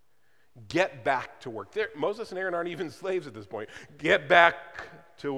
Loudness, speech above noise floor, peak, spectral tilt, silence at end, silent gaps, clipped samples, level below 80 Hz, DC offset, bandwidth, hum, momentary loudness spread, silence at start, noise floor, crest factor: -27 LUFS; 42 dB; -2 dBFS; -4.5 dB/octave; 0 s; none; under 0.1%; -66 dBFS; 0.1%; 13 kHz; none; 20 LU; 0.55 s; -70 dBFS; 26 dB